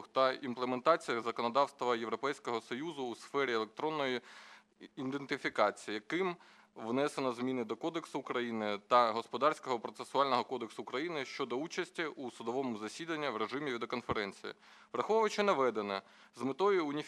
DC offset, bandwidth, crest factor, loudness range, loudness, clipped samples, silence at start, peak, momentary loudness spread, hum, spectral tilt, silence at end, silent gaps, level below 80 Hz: under 0.1%; 13 kHz; 22 dB; 4 LU; -35 LUFS; under 0.1%; 0 s; -14 dBFS; 11 LU; none; -4.5 dB/octave; 0 s; none; -76 dBFS